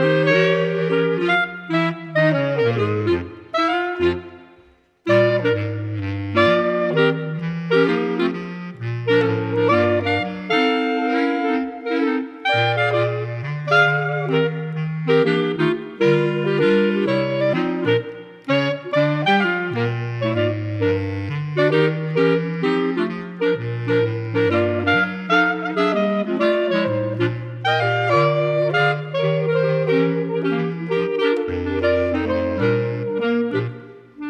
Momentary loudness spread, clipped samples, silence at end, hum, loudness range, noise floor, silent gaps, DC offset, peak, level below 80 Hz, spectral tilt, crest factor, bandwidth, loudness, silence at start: 7 LU; under 0.1%; 0 s; none; 2 LU; -53 dBFS; none; under 0.1%; -2 dBFS; -54 dBFS; -7.5 dB/octave; 18 dB; 9 kHz; -20 LUFS; 0 s